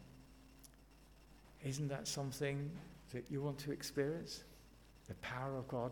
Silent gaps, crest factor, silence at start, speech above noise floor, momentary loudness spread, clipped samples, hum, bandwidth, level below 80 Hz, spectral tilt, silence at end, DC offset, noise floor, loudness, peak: none; 20 dB; 0 s; 21 dB; 23 LU; under 0.1%; none; 18.5 kHz; -66 dBFS; -5 dB/octave; 0 s; under 0.1%; -64 dBFS; -44 LUFS; -24 dBFS